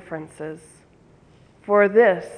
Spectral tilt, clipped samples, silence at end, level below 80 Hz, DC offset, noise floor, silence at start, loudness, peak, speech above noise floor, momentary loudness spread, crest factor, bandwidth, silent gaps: -6.5 dB/octave; under 0.1%; 0 s; -64 dBFS; under 0.1%; -53 dBFS; 0.1 s; -17 LUFS; -4 dBFS; 33 dB; 24 LU; 18 dB; 10.5 kHz; none